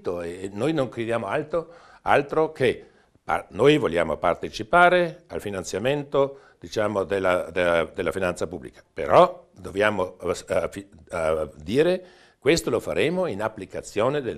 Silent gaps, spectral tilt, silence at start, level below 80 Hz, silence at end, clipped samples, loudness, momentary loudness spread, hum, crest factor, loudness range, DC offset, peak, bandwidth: none; -5 dB/octave; 0.05 s; -52 dBFS; 0 s; under 0.1%; -24 LUFS; 14 LU; none; 22 dB; 3 LU; under 0.1%; -2 dBFS; 13.5 kHz